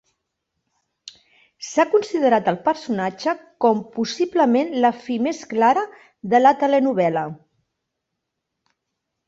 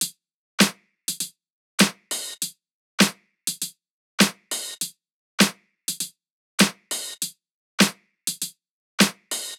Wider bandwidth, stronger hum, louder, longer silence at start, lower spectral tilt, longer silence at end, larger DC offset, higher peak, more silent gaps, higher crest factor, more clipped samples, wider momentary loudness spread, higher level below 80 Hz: second, 8 kHz vs 18.5 kHz; neither; first, -20 LUFS vs -24 LUFS; first, 1.05 s vs 0 s; first, -5.5 dB/octave vs -2.5 dB/octave; first, 1.9 s vs 0.05 s; neither; about the same, -2 dBFS vs -2 dBFS; second, none vs 0.34-0.58 s, 1.50-1.78 s, 2.73-2.98 s, 3.90-4.18 s, 5.12-5.38 s, 6.30-6.58 s, 7.51-7.78 s, 8.70-8.98 s; second, 18 dB vs 24 dB; neither; about the same, 10 LU vs 12 LU; about the same, -68 dBFS vs -64 dBFS